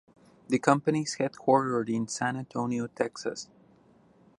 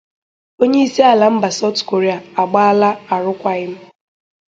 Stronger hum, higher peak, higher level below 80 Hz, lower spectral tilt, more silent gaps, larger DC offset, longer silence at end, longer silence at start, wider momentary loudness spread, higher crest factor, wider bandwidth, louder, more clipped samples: neither; second, -6 dBFS vs 0 dBFS; second, -72 dBFS vs -62 dBFS; about the same, -5 dB/octave vs -5 dB/octave; neither; neither; first, 0.95 s vs 0.7 s; about the same, 0.5 s vs 0.6 s; about the same, 11 LU vs 9 LU; first, 24 dB vs 16 dB; first, 11.5 kHz vs 7.8 kHz; second, -29 LUFS vs -15 LUFS; neither